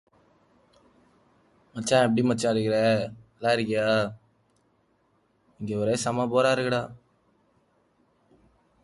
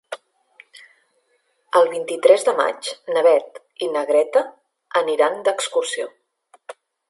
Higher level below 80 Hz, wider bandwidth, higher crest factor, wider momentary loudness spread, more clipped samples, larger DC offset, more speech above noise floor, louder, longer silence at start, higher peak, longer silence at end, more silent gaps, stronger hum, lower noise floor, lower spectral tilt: first, -64 dBFS vs -78 dBFS; about the same, 11.5 kHz vs 11.5 kHz; about the same, 18 dB vs 20 dB; second, 11 LU vs 15 LU; neither; neither; second, 44 dB vs 48 dB; second, -25 LUFS vs -19 LUFS; first, 1.75 s vs 0.1 s; second, -10 dBFS vs 0 dBFS; first, 1.9 s vs 0.35 s; neither; neither; about the same, -68 dBFS vs -66 dBFS; first, -5 dB/octave vs -1.5 dB/octave